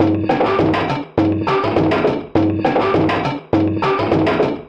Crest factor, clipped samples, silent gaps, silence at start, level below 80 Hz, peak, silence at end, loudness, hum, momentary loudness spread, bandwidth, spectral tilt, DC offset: 14 dB; under 0.1%; none; 0 s; -44 dBFS; -2 dBFS; 0 s; -17 LUFS; none; 3 LU; 7.4 kHz; -8 dB/octave; under 0.1%